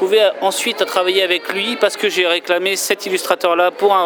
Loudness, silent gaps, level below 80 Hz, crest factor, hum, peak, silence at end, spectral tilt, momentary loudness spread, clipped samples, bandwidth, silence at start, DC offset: -16 LUFS; none; -76 dBFS; 16 dB; none; 0 dBFS; 0 s; -1.5 dB/octave; 4 LU; under 0.1%; over 20 kHz; 0 s; under 0.1%